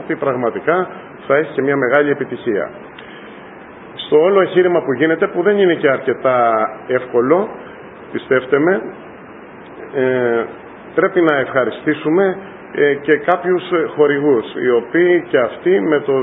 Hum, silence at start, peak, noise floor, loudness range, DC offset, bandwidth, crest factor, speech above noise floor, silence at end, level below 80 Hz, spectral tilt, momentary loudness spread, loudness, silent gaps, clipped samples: none; 0 s; 0 dBFS; -36 dBFS; 4 LU; under 0.1%; 4 kHz; 16 dB; 21 dB; 0 s; -60 dBFS; -9.5 dB/octave; 21 LU; -16 LUFS; none; under 0.1%